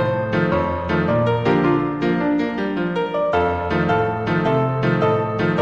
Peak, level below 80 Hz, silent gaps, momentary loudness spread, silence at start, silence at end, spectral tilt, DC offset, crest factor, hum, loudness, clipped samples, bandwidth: -6 dBFS; -44 dBFS; none; 3 LU; 0 s; 0 s; -8.5 dB/octave; 0.2%; 14 dB; none; -19 LUFS; under 0.1%; 7.2 kHz